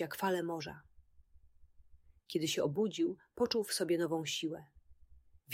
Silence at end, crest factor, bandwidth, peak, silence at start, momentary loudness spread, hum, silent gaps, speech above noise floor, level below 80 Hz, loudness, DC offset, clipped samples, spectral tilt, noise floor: 0 s; 18 dB; 16 kHz; -20 dBFS; 0 s; 9 LU; none; none; 27 dB; -68 dBFS; -36 LUFS; under 0.1%; under 0.1%; -4 dB/octave; -63 dBFS